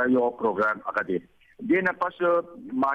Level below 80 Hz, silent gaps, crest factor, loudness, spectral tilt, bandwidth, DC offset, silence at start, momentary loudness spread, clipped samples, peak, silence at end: -66 dBFS; none; 14 dB; -26 LUFS; -8 dB/octave; 6.2 kHz; under 0.1%; 0 s; 8 LU; under 0.1%; -12 dBFS; 0 s